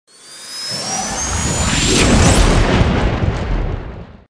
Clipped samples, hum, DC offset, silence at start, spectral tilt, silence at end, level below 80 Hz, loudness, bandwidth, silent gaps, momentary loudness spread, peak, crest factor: under 0.1%; none; under 0.1%; 0.25 s; -4 dB/octave; 0.15 s; -20 dBFS; -15 LUFS; 11 kHz; none; 15 LU; 0 dBFS; 16 dB